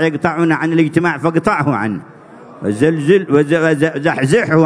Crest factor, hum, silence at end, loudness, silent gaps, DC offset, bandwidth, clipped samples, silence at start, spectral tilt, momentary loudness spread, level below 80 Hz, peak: 14 dB; none; 0 s; -14 LUFS; none; under 0.1%; 11 kHz; under 0.1%; 0 s; -7 dB/octave; 7 LU; -52 dBFS; 0 dBFS